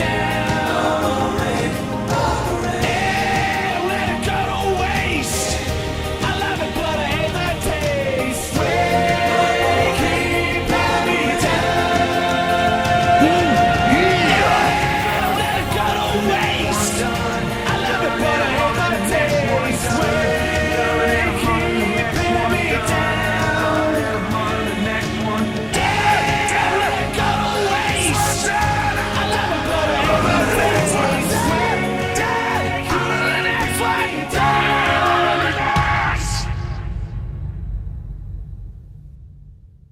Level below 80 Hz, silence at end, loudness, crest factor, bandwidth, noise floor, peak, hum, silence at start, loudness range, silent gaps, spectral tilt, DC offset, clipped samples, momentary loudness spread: -34 dBFS; 0.25 s; -18 LUFS; 16 dB; 17.5 kHz; -43 dBFS; -2 dBFS; none; 0 s; 4 LU; none; -4.5 dB/octave; under 0.1%; under 0.1%; 6 LU